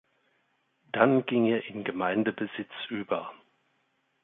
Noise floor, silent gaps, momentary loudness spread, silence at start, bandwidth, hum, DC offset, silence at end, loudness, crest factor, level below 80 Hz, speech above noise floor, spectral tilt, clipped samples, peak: -73 dBFS; none; 12 LU; 0.95 s; 4 kHz; none; under 0.1%; 0.85 s; -28 LUFS; 24 dB; -74 dBFS; 46 dB; -9.5 dB/octave; under 0.1%; -8 dBFS